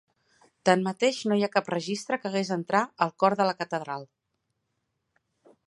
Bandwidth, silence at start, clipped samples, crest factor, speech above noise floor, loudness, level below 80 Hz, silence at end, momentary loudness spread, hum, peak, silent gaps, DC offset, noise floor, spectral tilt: 11.5 kHz; 0.65 s; under 0.1%; 24 dB; 53 dB; -27 LUFS; -78 dBFS; 1.65 s; 8 LU; none; -4 dBFS; none; under 0.1%; -79 dBFS; -5 dB/octave